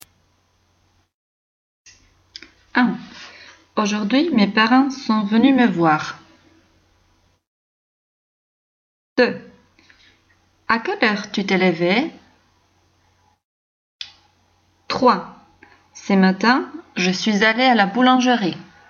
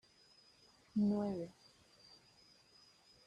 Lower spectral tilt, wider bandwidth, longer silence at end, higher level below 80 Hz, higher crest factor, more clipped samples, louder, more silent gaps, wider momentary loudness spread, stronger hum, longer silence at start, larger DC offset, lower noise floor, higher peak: second, -5 dB/octave vs -8 dB/octave; second, 7.2 kHz vs 9.4 kHz; second, 0.25 s vs 1.75 s; first, -64 dBFS vs -76 dBFS; about the same, 18 dB vs 18 dB; neither; first, -18 LUFS vs -39 LUFS; first, 7.47-9.16 s, 13.44-13.99 s vs none; second, 21 LU vs 27 LU; neither; first, 2.75 s vs 0.95 s; neither; second, -62 dBFS vs -68 dBFS; first, -4 dBFS vs -26 dBFS